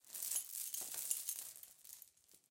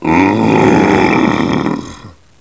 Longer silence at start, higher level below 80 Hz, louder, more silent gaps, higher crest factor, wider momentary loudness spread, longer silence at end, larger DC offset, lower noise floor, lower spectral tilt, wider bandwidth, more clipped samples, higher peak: about the same, 0.05 s vs 0 s; second, under -90 dBFS vs -36 dBFS; second, -42 LUFS vs -11 LUFS; neither; first, 28 dB vs 12 dB; first, 16 LU vs 11 LU; second, 0.1 s vs 0.3 s; second, under 0.1% vs 0.4%; first, -65 dBFS vs -35 dBFS; second, 2.5 dB/octave vs -6.5 dB/octave; first, 17 kHz vs 8 kHz; second, under 0.1% vs 0.1%; second, -18 dBFS vs 0 dBFS